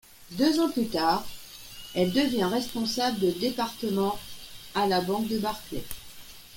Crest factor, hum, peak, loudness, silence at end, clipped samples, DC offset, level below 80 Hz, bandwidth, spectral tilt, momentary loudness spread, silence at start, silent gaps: 18 dB; none; -10 dBFS; -27 LUFS; 0 s; under 0.1%; under 0.1%; -54 dBFS; 17 kHz; -4.5 dB/octave; 17 LU; 0.2 s; none